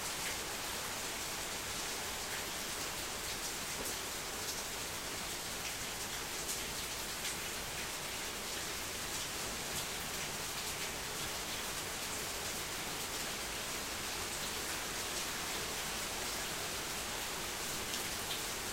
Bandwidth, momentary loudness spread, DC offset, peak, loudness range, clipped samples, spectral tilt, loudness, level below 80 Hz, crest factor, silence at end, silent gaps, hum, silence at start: 16 kHz; 2 LU; under 0.1%; -22 dBFS; 1 LU; under 0.1%; -1 dB/octave; -38 LUFS; -58 dBFS; 18 dB; 0 s; none; none; 0 s